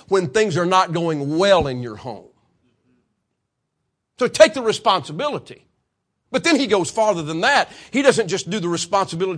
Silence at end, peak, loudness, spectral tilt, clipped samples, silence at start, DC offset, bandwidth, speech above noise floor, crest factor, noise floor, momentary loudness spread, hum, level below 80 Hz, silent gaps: 0 s; 0 dBFS; -18 LUFS; -4 dB/octave; under 0.1%; 0.1 s; under 0.1%; 10.5 kHz; 57 dB; 20 dB; -76 dBFS; 11 LU; none; -52 dBFS; none